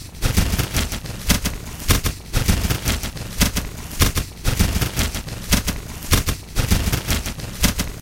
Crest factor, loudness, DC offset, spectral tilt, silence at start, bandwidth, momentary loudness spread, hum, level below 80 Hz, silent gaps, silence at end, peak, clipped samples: 20 dB; -22 LUFS; under 0.1%; -3.5 dB/octave; 0 s; 17 kHz; 7 LU; none; -26 dBFS; none; 0 s; 0 dBFS; under 0.1%